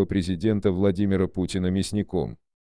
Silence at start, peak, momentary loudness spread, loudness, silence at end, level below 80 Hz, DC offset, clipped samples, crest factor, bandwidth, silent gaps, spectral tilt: 0 s; -10 dBFS; 6 LU; -25 LUFS; 0.35 s; -46 dBFS; 0.4%; under 0.1%; 16 dB; 10.5 kHz; none; -7 dB/octave